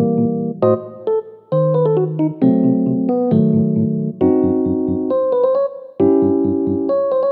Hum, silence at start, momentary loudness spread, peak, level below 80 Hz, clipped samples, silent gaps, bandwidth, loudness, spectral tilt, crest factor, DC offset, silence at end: none; 0 s; 6 LU; -2 dBFS; -54 dBFS; under 0.1%; none; 4.3 kHz; -17 LUFS; -13.5 dB/octave; 14 dB; under 0.1%; 0 s